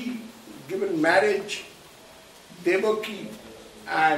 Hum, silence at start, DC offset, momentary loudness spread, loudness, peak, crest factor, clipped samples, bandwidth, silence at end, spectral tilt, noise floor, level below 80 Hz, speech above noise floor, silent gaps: none; 0 s; under 0.1%; 23 LU; -25 LUFS; -8 dBFS; 18 dB; under 0.1%; 16 kHz; 0 s; -4 dB/octave; -49 dBFS; -66 dBFS; 25 dB; none